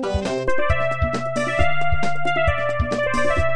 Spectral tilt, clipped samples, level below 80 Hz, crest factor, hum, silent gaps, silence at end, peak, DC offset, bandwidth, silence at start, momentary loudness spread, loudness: -5.5 dB/octave; under 0.1%; -32 dBFS; 14 dB; none; none; 0 s; -4 dBFS; under 0.1%; 10 kHz; 0 s; 3 LU; -22 LUFS